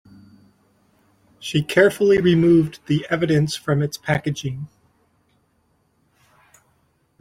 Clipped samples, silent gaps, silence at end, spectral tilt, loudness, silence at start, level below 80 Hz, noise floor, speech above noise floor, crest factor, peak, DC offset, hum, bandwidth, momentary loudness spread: under 0.1%; none; 2.55 s; -6.5 dB/octave; -19 LUFS; 1.4 s; -54 dBFS; -65 dBFS; 46 dB; 20 dB; -2 dBFS; under 0.1%; none; 15.5 kHz; 14 LU